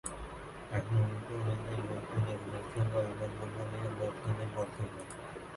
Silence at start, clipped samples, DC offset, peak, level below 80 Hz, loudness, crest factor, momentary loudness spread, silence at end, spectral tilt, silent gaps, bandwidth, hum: 0.05 s; under 0.1%; under 0.1%; -20 dBFS; -56 dBFS; -37 LUFS; 16 dB; 12 LU; 0 s; -6.5 dB/octave; none; 11.5 kHz; none